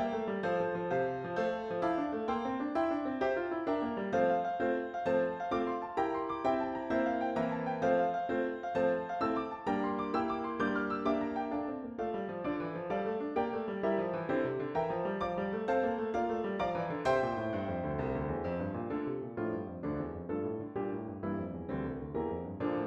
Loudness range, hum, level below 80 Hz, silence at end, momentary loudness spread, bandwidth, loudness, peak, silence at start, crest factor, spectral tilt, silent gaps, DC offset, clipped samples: 4 LU; none; -60 dBFS; 0 s; 6 LU; 8.2 kHz; -34 LUFS; -18 dBFS; 0 s; 16 dB; -7.5 dB/octave; none; under 0.1%; under 0.1%